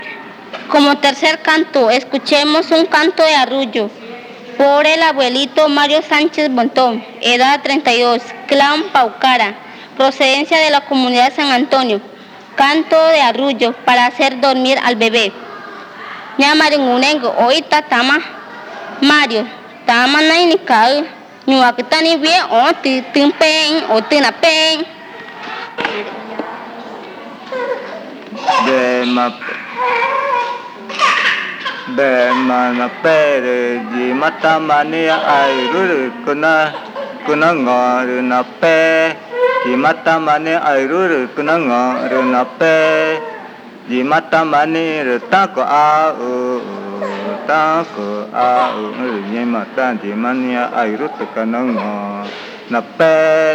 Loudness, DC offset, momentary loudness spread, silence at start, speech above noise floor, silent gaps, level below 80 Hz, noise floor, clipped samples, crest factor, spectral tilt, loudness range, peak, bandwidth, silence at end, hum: -13 LUFS; under 0.1%; 15 LU; 0 s; 20 dB; none; -70 dBFS; -33 dBFS; under 0.1%; 14 dB; -3.5 dB/octave; 5 LU; 0 dBFS; 15.5 kHz; 0 s; none